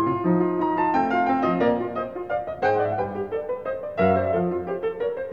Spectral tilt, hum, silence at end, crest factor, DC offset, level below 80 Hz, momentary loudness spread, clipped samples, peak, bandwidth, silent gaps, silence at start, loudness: -9 dB/octave; none; 0 s; 16 dB; 0.2%; -56 dBFS; 8 LU; under 0.1%; -8 dBFS; 7 kHz; none; 0 s; -24 LUFS